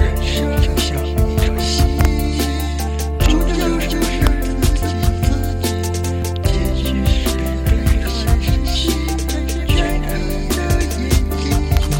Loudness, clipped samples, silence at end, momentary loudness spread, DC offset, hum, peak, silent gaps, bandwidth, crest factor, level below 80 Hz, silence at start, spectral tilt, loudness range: -18 LUFS; under 0.1%; 0 s; 4 LU; under 0.1%; none; 0 dBFS; none; 17 kHz; 16 dB; -18 dBFS; 0 s; -5.5 dB/octave; 1 LU